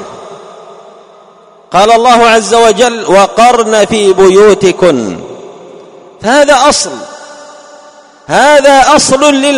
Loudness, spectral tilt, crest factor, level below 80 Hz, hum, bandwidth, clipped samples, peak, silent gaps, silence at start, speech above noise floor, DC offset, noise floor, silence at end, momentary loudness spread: -6 LUFS; -3 dB/octave; 8 dB; -40 dBFS; none; 15.5 kHz; 4%; 0 dBFS; none; 0 s; 33 dB; under 0.1%; -39 dBFS; 0 s; 14 LU